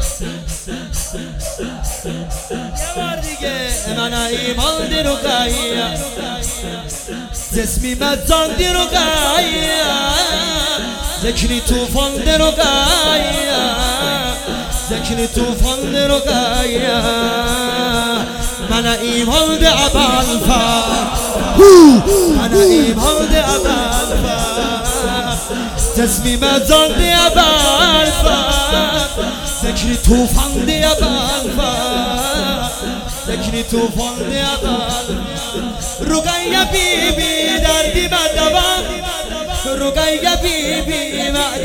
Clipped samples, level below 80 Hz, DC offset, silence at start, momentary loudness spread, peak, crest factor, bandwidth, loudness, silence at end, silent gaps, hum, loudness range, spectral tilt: 0.5%; -24 dBFS; under 0.1%; 0 s; 11 LU; 0 dBFS; 14 dB; 18.5 kHz; -14 LUFS; 0 s; none; none; 9 LU; -3 dB/octave